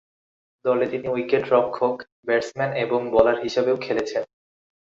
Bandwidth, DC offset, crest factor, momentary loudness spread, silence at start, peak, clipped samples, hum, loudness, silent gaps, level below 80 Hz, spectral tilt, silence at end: 7.6 kHz; under 0.1%; 22 dB; 9 LU; 0.65 s; -2 dBFS; under 0.1%; none; -23 LUFS; 2.12-2.23 s; -56 dBFS; -5.5 dB/octave; 0.65 s